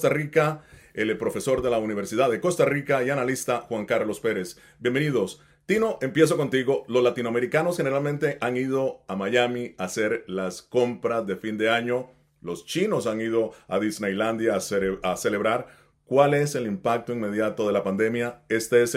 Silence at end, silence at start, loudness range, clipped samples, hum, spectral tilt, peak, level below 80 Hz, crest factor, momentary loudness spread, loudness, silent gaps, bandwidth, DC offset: 0 s; 0 s; 3 LU; under 0.1%; none; -5 dB/octave; -6 dBFS; -60 dBFS; 20 dB; 8 LU; -25 LUFS; none; 16 kHz; under 0.1%